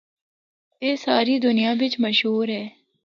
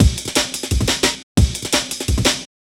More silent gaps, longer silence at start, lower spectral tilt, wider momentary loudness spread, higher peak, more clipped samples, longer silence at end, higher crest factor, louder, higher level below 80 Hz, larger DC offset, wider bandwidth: second, none vs 1.23-1.35 s; first, 0.8 s vs 0 s; first, -5.5 dB/octave vs -3.5 dB/octave; first, 8 LU vs 4 LU; second, -6 dBFS vs 0 dBFS; neither; about the same, 0.35 s vs 0.3 s; about the same, 18 dB vs 18 dB; second, -21 LUFS vs -18 LUFS; second, -72 dBFS vs -24 dBFS; neither; second, 7.2 kHz vs 17 kHz